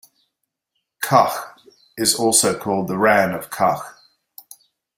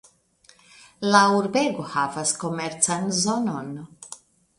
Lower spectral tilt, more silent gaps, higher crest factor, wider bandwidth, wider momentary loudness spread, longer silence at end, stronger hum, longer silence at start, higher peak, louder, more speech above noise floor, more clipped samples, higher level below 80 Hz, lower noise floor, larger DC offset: about the same, -3 dB/octave vs -3.5 dB/octave; neither; about the same, 22 dB vs 22 dB; first, 16.5 kHz vs 11.5 kHz; second, 14 LU vs 22 LU; first, 1.05 s vs 0.45 s; neither; about the same, 1 s vs 1 s; about the same, 0 dBFS vs -2 dBFS; first, -18 LUFS vs -22 LUFS; first, 59 dB vs 35 dB; neither; first, -60 dBFS vs -66 dBFS; first, -77 dBFS vs -58 dBFS; neither